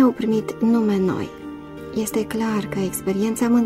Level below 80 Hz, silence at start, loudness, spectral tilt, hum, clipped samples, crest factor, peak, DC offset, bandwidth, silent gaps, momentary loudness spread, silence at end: -50 dBFS; 0 s; -22 LUFS; -6 dB/octave; none; under 0.1%; 14 dB; -6 dBFS; under 0.1%; 16 kHz; none; 13 LU; 0 s